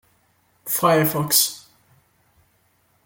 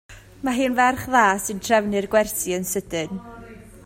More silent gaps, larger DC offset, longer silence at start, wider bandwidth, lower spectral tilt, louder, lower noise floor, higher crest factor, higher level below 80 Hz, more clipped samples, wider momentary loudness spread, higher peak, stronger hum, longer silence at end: neither; neither; first, 0.65 s vs 0.1 s; about the same, 17 kHz vs 16.5 kHz; about the same, -3 dB/octave vs -3.5 dB/octave; first, -18 LUFS vs -21 LUFS; first, -63 dBFS vs -42 dBFS; about the same, 22 dB vs 20 dB; second, -64 dBFS vs -50 dBFS; neither; first, 18 LU vs 13 LU; about the same, -2 dBFS vs -2 dBFS; neither; first, 1.45 s vs 0.05 s